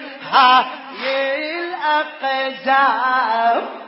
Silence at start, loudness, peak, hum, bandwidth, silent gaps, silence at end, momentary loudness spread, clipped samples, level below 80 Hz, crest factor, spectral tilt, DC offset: 0 s; -17 LUFS; 0 dBFS; none; 5.8 kHz; none; 0 s; 10 LU; under 0.1%; -76 dBFS; 18 dB; -5.5 dB/octave; under 0.1%